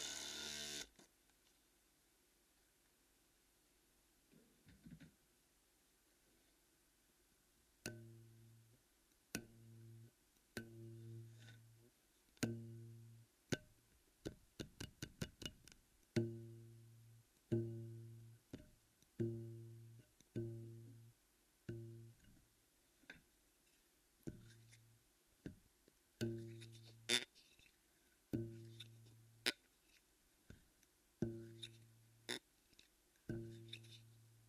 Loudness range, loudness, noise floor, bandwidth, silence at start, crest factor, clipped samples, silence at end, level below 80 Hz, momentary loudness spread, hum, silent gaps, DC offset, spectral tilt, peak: 17 LU; -50 LUFS; -77 dBFS; 15 kHz; 0 s; 36 dB; under 0.1%; 0 s; -74 dBFS; 23 LU; none; none; under 0.1%; -4 dB/octave; -18 dBFS